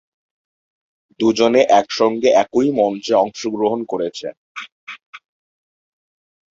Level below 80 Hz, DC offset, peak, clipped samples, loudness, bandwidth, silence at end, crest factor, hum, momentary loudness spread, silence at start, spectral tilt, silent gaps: -62 dBFS; under 0.1%; -2 dBFS; under 0.1%; -17 LUFS; 7.8 kHz; 1.35 s; 18 dB; none; 19 LU; 1.2 s; -4.5 dB/octave; 4.37-4.55 s, 4.72-4.87 s, 5.06-5.13 s